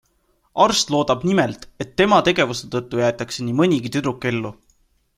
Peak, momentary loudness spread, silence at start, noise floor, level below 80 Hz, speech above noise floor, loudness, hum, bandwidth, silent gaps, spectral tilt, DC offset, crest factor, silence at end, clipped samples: -2 dBFS; 11 LU; 0.55 s; -64 dBFS; -52 dBFS; 45 dB; -19 LUFS; none; 15 kHz; none; -4.5 dB/octave; under 0.1%; 18 dB; 0.65 s; under 0.1%